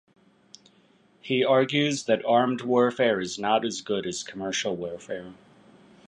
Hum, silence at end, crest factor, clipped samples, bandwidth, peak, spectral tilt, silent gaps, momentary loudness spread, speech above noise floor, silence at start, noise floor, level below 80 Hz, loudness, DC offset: none; 0.75 s; 18 dB; under 0.1%; 10.5 kHz; -8 dBFS; -4 dB/octave; none; 14 LU; 36 dB; 1.25 s; -61 dBFS; -68 dBFS; -25 LUFS; under 0.1%